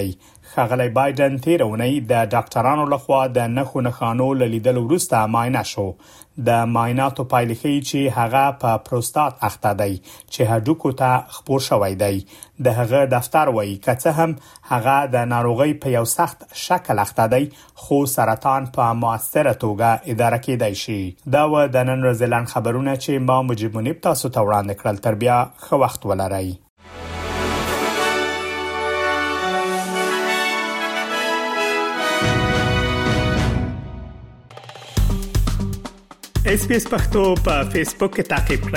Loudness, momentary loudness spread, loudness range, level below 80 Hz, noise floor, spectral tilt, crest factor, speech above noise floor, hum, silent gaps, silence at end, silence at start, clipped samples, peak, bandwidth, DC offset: -20 LUFS; 7 LU; 3 LU; -34 dBFS; -40 dBFS; -5.5 dB/octave; 16 dB; 21 dB; none; 26.70-26.76 s; 0 s; 0 s; under 0.1%; -4 dBFS; 16.5 kHz; under 0.1%